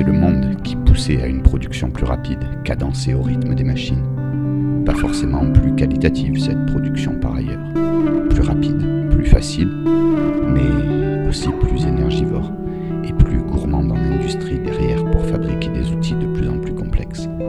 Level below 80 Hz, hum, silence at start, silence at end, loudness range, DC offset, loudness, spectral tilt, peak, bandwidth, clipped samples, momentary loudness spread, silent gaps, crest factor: -22 dBFS; none; 0 s; 0 s; 3 LU; under 0.1%; -18 LUFS; -7.5 dB/octave; 0 dBFS; 11 kHz; 0.1%; 7 LU; none; 16 dB